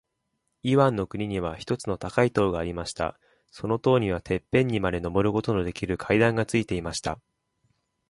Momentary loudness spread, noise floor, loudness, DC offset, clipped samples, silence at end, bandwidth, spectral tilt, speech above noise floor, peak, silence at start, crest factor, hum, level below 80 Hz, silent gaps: 10 LU; -78 dBFS; -26 LUFS; under 0.1%; under 0.1%; 0.95 s; 11.5 kHz; -6 dB/octave; 52 dB; -6 dBFS; 0.65 s; 20 dB; none; -48 dBFS; none